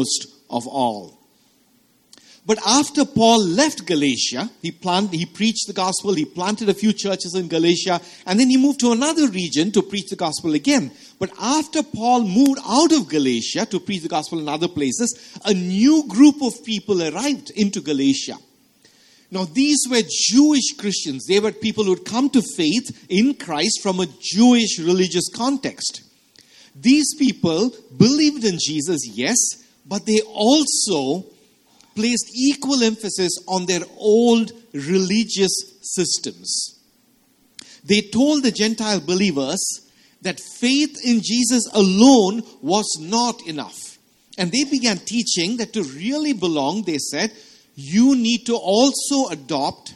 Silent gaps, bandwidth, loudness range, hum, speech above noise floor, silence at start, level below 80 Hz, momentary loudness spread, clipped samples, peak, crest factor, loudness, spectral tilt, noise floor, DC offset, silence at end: none; 13 kHz; 3 LU; none; 40 dB; 0 s; -62 dBFS; 11 LU; under 0.1%; 0 dBFS; 20 dB; -19 LUFS; -3.5 dB/octave; -59 dBFS; under 0.1%; 0.05 s